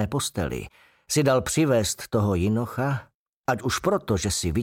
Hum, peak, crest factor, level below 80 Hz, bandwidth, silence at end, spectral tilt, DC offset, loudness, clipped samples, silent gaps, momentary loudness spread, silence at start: none; -12 dBFS; 14 dB; -44 dBFS; 17 kHz; 0 s; -5 dB/octave; under 0.1%; -25 LUFS; under 0.1%; 3.15-3.44 s; 9 LU; 0 s